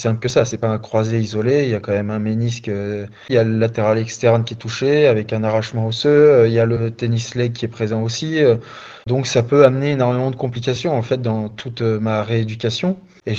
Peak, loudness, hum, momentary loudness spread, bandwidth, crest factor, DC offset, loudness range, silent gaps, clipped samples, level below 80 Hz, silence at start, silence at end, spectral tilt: 0 dBFS; -18 LUFS; none; 10 LU; 7.8 kHz; 18 dB; under 0.1%; 4 LU; none; under 0.1%; -52 dBFS; 0 s; 0 s; -6.5 dB/octave